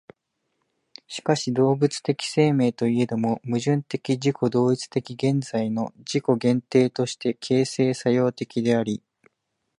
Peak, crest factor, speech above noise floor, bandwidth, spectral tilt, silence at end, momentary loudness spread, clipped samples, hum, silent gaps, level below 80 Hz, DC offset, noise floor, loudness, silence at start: -6 dBFS; 18 dB; 55 dB; 11 kHz; -6 dB/octave; 0.8 s; 6 LU; under 0.1%; none; none; -66 dBFS; under 0.1%; -77 dBFS; -23 LUFS; 1.1 s